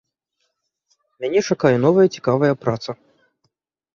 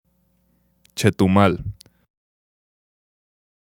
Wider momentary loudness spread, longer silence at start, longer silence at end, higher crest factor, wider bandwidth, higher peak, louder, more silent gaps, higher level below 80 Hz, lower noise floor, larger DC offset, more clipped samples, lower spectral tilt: second, 14 LU vs 18 LU; first, 1.2 s vs 0.95 s; second, 1 s vs 1.9 s; second, 18 dB vs 24 dB; second, 7.4 kHz vs 16.5 kHz; about the same, -2 dBFS vs 0 dBFS; about the same, -18 LUFS vs -19 LUFS; neither; second, -60 dBFS vs -50 dBFS; first, -73 dBFS vs -64 dBFS; neither; neither; about the same, -6.5 dB/octave vs -6.5 dB/octave